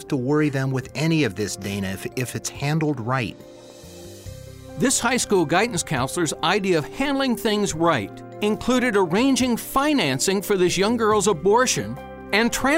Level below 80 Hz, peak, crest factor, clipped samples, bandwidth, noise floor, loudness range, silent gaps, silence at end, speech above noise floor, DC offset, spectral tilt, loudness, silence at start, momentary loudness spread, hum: -48 dBFS; -6 dBFS; 16 dB; under 0.1%; 16 kHz; -41 dBFS; 6 LU; none; 0 s; 20 dB; under 0.1%; -4 dB/octave; -21 LUFS; 0 s; 12 LU; none